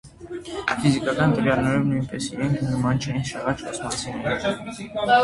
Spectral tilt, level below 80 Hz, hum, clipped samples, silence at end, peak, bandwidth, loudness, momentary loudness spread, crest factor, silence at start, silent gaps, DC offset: -5.5 dB/octave; -48 dBFS; none; under 0.1%; 0 s; -6 dBFS; 11.5 kHz; -24 LUFS; 9 LU; 18 dB; 0.05 s; none; under 0.1%